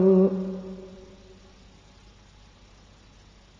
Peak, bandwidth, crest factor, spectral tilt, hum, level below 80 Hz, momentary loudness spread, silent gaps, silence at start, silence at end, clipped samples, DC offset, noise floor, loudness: -10 dBFS; 7 kHz; 18 dB; -10 dB/octave; 50 Hz at -55 dBFS; -56 dBFS; 29 LU; none; 0 s; 2.65 s; under 0.1%; under 0.1%; -53 dBFS; -25 LUFS